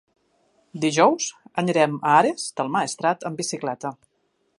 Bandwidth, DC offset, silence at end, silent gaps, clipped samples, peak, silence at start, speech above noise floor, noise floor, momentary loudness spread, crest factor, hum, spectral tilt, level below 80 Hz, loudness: 11.5 kHz; under 0.1%; 0.65 s; none; under 0.1%; -4 dBFS; 0.75 s; 48 dB; -70 dBFS; 11 LU; 20 dB; none; -4 dB/octave; -76 dBFS; -22 LUFS